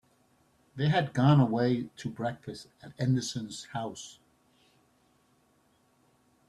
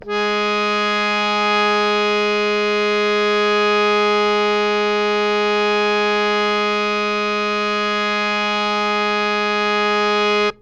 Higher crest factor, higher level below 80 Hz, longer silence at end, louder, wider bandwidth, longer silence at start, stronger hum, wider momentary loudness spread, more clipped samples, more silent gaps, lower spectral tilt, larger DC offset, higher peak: first, 20 dB vs 14 dB; second, -66 dBFS vs -52 dBFS; first, 2.35 s vs 0.1 s; second, -29 LUFS vs -17 LUFS; first, 11 kHz vs 8.8 kHz; first, 0.75 s vs 0 s; neither; first, 21 LU vs 3 LU; neither; neither; first, -6.5 dB/octave vs -3.5 dB/octave; neither; second, -12 dBFS vs -4 dBFS